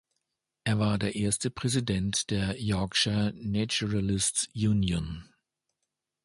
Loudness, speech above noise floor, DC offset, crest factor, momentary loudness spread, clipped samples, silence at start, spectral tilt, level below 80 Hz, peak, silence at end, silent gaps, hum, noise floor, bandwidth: -28 LUFS; 56 dB; under 0.1%; 18 dB; 5 LU; under 0.1%; 0.65 s; -4.5 dB/octave; -48 dBFS; -12 dBFS; 1 s; none; none; -85 dBFS; 11.5 kHz